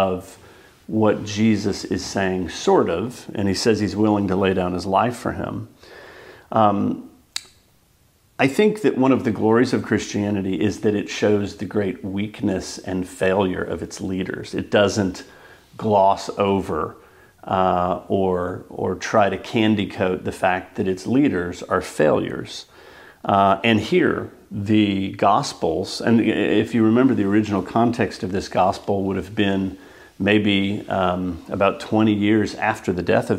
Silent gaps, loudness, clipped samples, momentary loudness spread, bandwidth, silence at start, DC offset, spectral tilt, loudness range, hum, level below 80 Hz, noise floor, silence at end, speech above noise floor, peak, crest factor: none; -21 LUFS; under 0.1%; 10 LU; 15 kHz; 0 s; under 0.1%; -6 dB/octave; 4 LU; none; -52 dBFS; -58 dBFS; 0 s; 38 dB; 0 dBFS; 20 dB